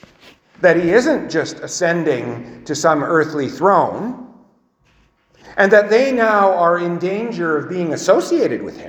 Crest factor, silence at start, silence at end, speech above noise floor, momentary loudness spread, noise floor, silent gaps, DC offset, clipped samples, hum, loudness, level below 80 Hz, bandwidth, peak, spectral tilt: 16 dB; 0.6 s; 0 s; 42 dB; 12 LU; -57 dBFS; none; under 0.1%; under 0.1%; none; -16 LUFS; -58 dBFS; 14 kHz; 0 dBFS; -5 dB/octave